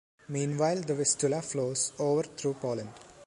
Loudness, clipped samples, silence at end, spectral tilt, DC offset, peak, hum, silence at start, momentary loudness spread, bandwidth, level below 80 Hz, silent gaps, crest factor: -30 LUFS; under 0.1%; 0 s; -4.5 dB/octave; under 0.1%; -14 dBFS; none; 0.3 s; 9 LU; 11.5 kHz; -70 dBFS; none; 18 dB